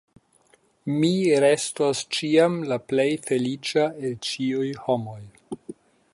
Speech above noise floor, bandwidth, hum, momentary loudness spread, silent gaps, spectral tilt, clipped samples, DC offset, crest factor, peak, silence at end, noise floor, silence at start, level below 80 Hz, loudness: 38 dB; 11.5 kHz; none; 19 LU; none; -5 dB/octave; under 0.1%; under 0.1%; 18 dB; -6 dBFS; 0.4 s; -61 dBFS; 0.85 s; -68 dBFS; -23 LUFS